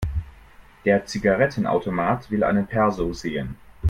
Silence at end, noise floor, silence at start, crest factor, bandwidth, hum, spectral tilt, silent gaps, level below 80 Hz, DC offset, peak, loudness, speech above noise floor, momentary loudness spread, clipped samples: 0 s; -48 dBFS; 0 s; 18 dB; 12 kHz; none; -7 dB/octave; none; -38 dBFS; under 0.1%; -6 dBFS; -23 LUFS; 26 dB; 10 LU; under 0.1%